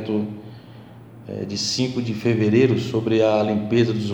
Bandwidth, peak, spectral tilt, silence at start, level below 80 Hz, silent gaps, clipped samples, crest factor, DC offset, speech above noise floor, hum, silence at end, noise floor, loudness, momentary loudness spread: 16 kHz; -4 dBFS; -6 dB/octave; 0 s; -58 dBFS; none; under 0.1%; 16 dB; under 0.1%; 22 dB; none; 0 s; -42 dBFS; -21 LUFS; 16 LU